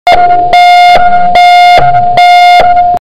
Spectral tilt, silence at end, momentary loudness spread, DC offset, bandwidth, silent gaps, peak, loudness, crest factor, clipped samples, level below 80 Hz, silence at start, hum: -3 dB/octave; 0.1 s; 4 LU; 10%; 12.5 kHz; none; 0 dBFS; -3 LUFS; 4 dB; under 0.1%; -28 dBFS; 0.05 s; none